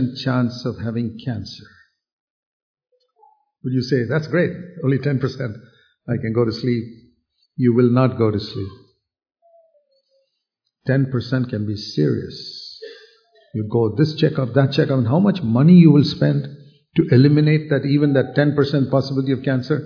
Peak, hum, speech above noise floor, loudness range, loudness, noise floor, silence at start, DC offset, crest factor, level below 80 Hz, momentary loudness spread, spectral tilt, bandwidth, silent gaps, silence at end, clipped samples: -2 dBFS; none; 58 dB; 11 LU; -18 LUFS; -76 dBFS; 0 s; under 0.1%; 18 dB; -56 dBFS; 17 LU; -8.5 dB/octave; 5.4 kHz; 2.13-2.74 s; 0 s; under 0.1%